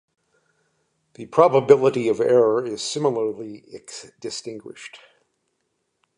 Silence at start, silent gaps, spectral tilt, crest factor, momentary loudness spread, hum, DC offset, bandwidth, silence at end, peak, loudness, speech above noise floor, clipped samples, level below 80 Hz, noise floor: 1.2 s; none; -5 dB/octave; 22 dB; 22 LU; none; under 0.1%; 11 kHz; 1.2 s; -2 dBFS; -20 LUFS; 53 dB; under 0.1%; -70 dBFS; -74 dBFS